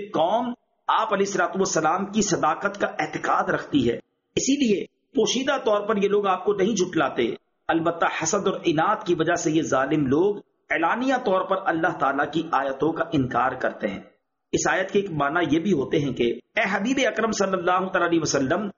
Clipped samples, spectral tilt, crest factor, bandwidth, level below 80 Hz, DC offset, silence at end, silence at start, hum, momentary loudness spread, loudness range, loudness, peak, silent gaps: under 0.1%; -4 dB/octave; 16 dB; 7.4 kHz; -58 dBFS; under 0.1%; 0.05 s; 0 s; none; 5 LU; 2 LU; -23 LUFS; -8 dBFS; none